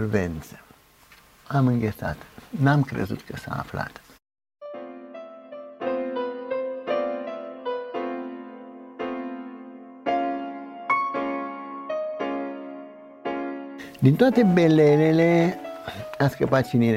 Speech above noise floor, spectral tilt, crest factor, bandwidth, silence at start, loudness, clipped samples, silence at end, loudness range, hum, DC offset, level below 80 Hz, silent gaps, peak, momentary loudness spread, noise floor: 33 dB; -8 dB/octave; 20 dB; 16 kHz; 0 s; -24 LUFS; under 0.1%; 0 s; 12 LU; none; under 0.1%; -54 dBFS; none; -4 dBFS; 22 LU; -54 dBFS